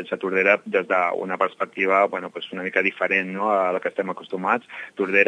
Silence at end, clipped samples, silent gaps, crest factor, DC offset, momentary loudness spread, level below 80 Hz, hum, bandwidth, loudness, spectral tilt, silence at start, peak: 0 s; under 0.1%; none; 20 dB; under 0.1%; 10 LU; -80 dBFS; none; 9.8 kHz; -22 LUFS; -6 dB/octave; 0 s; -2 dBFS